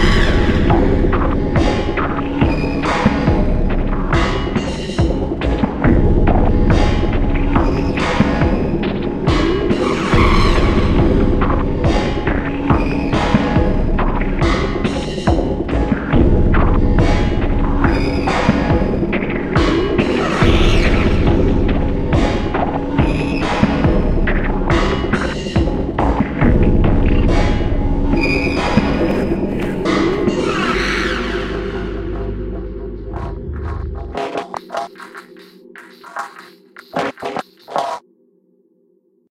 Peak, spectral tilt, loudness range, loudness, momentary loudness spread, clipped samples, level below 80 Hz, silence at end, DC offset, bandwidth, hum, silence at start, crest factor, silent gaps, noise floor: 0 dBFS; -7 dB/octave; 11 LU; -17 LUFS; 10 LU; under 0.1%; -20 dBFS; 1.3 s; under 0.1%; 9.8 kHz; none; 0 s; 16 dB; none; -58 dBFS